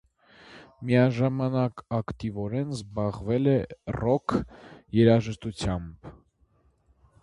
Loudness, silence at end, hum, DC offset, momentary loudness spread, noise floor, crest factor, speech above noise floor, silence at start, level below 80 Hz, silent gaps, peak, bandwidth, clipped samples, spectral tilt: -27 LUFS; 1.1 s; none; under 0.1%; 13 LU; -65 dBFS; 20 dB; 39 dB; 0.5 s; -48 dBFS; none; -6 dBFS; 11 kHz; under 0.1%; -8 dB/octave